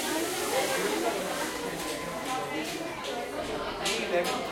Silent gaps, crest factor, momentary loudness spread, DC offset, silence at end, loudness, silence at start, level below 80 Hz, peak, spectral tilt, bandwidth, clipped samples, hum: none; 16 dB; 6 LU; under 0.1%; 0 s; -31 LUFS; 0 s; -58 dBFS; -16 dBFS; -2.5 dB/octave; 16.5 kHz; under 0.1%; none